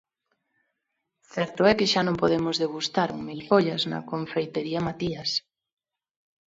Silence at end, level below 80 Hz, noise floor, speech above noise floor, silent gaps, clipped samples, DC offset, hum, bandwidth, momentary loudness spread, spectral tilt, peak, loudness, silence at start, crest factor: 1.1 s; -60 dBFS; -81 dBFS; 56 dB; none; under 0.1%; under 0.1%; none; 8 kHz; 9 LU; -5 dB/octave; -6 dBFS; -25 LUFS; 1.35 s; 22 dB